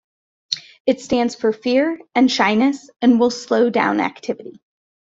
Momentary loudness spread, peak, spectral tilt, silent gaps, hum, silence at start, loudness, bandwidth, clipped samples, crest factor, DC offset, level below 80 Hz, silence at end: 11 LU; -2 dBFS; -4.5 dB/octave; 0.80-0.85 s; none; 0.5 s; -18 LUFS; 7.8 kHz; under 0.1%; 16 dB; under 0.1%; -60 dBFS; 0.6 s